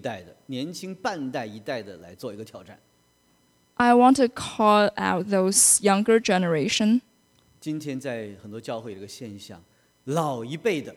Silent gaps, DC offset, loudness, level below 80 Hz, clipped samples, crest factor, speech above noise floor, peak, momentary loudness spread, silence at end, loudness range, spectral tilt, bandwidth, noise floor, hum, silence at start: none; under 0.1%; -22 LUFS; -64 dBFS; under 0.1%; 22 dB; 40 dB; -4 dBFS; 22 LU; 0 s; 15 LU; -3.5 dB/octave; 16 kHz; -64 dBFS; none; 0.05 s